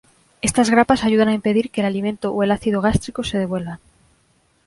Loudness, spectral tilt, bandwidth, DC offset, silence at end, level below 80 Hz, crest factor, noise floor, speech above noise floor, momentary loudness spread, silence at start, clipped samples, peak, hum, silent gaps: -19 LUFS; -5 dB/octave; 11.5 kHz; under 0.1%; 0.9 s; -42 dBFS; 18 dB; -61 dBFS; 42 dB; 9 LU; 0.45 s; under 0.1%; -2 dBFS; none; none